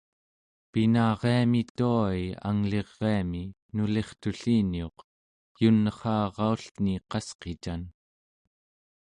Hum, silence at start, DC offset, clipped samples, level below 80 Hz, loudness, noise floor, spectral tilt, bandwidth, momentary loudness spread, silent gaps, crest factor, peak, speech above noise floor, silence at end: none; 0.75 s; under 0.1%; under 0.1%; -50 dBFS; -28 LUFS; under -90 dBFS; -7.5 dB/octave; 10 kHz; 12 LU; 1.70-1.75 s, 3.62-3.69 s, 5.04-5.55 s, 6.71-6.75 s, 7.35-7.39 s; 18 dB; -10 dBFS; over 63 dB; 1.1 s